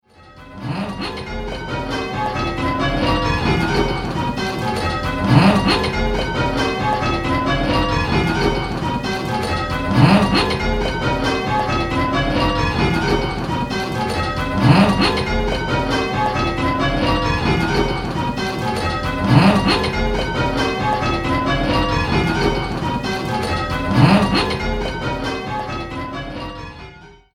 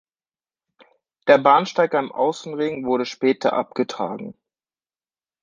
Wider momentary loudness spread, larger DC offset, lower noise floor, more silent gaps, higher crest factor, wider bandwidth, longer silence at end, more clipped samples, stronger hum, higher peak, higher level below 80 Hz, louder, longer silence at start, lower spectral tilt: about the same, 11 LU vs 12 LU; neither; second, -42 dBFS vs under -90 dBFS; neither; about the same, 18 dB vs 20 dB; first, 15 kHz vs 7.6 kHz; second, 0.2 s vs 1.1 s; neither; neither; about the same, 0 dBFS vs -2 dBFS; first, -30 dBFS vs -68 dBFS; about the same, -19 LUFS vs -20 LUFS; second, 0.25 s vs 1.25 s; about the same, -6 dB/octave vs -5 dB/octave